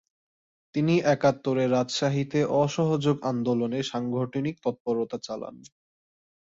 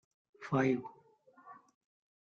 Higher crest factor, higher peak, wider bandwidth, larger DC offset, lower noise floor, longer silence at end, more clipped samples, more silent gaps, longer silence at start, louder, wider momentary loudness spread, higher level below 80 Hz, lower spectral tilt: about the same, 18 dB vs 20 dB; first, -10 dBFS vs -18 dBFS; first, 8 kHz vs 7.2 kHz; neither; first, under -90 dBFS vs -65 dBFS; first, 1 s vs 0.7 s; neither; first, 4.80-4.85 s vs none; first, 0.75 s vs 0.4 s; first, -26 LUFS vs -34 LUFS; second, 9 LU vs 25 LU; first, -66 dBFS vs -76 dBFS; second, -6.5 dB/octave vs -8 dB/octave